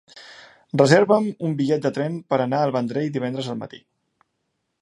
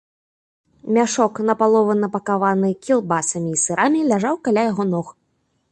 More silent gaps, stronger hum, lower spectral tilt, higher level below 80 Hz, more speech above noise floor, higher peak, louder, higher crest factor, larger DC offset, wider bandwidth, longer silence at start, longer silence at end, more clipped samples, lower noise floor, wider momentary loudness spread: neither; neither; first, -6.5 dB/octave vs -5 dB/octave; about the same, -68 dBFS vs -64 dBFS; first, 55 dB vs 49 dB; first, 0 dBFS vs -4 dBFS; about the same, -21 LUFS vs -19 LUFS; first, 22 dB vs 16 dB; neither; about the same, 11.5 kHz vs 11 kHz; second, 0.15 s vs 0.85 s; first, 1.05 s vs 0.6 s; neither; first, -75 dBFS vs -68 dBFS; first, 16 LU vs 5 LU